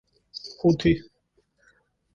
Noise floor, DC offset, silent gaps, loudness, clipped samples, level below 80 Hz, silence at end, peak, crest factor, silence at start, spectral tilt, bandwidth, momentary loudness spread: -69 dBFS; under 0.1%; none; -24 LUFS; under 0.1%; -48 dBFS; 1.15 s; -8 dBFS; 20 dB; 0.35 s; -7 dB/octave; 7.2 kHz; 19 LU